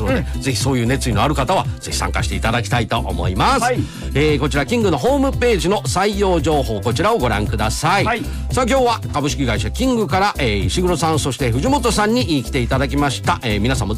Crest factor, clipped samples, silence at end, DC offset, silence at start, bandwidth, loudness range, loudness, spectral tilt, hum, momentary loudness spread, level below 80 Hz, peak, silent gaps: 10 dB; under 0.1%; 0 s; under 0.1%; 0 s; 15.5 kHz; 1 LU; -18 LUFS; -5 dB/octave; none; 4 LU; -26 dBFS; -8 dBFS; none